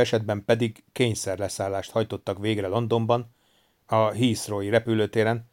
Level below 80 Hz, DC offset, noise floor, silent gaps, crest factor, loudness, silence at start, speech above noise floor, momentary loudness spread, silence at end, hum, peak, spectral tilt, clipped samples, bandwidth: -62 dBFS; under 0.1%; -65 dBFS; none; 18 dB; -25 LUFS; 0 s; 40 dB; 6 LU; 0.1 s; none; -6 dBFS; -5.5 dB/octave; under 0.1%; 17 kHz